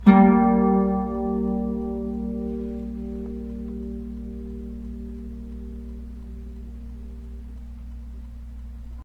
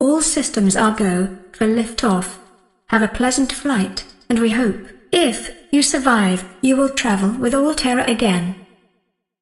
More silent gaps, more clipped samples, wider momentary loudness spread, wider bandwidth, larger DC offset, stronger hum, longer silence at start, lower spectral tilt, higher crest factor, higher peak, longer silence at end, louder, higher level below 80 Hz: neither; neither; first, 21 LU vs 7 LU; second, 4.4 kHz vs 12.5 kHz; neither; neither; about the same, 0 s vs 0 s; first, -10.5 dB/octave vs -4 dB/octave; first, 24 dB vs 18 dB; about the same, 0 dBFS vs 0 dBFS; second, 0 s vs 0.8 s; second, -24 LUFS vs -18 LUFS; first, -36 dBFS vs -42 dBFS